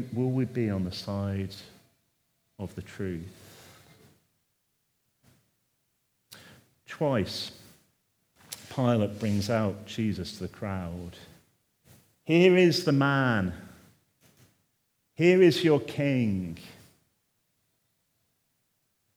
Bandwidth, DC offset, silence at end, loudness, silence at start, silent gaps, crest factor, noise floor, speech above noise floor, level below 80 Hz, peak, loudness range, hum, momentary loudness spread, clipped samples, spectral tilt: over 20 kHz; under 0.1%; 2.45 s; -27 LUFS; 0 s; none; 22 dB; -75 dBFS; 49 dB; -66 dBFS; -6 dBFS; 17 LU; none; 21 LU; under 0.1%; -6.5 dB/octave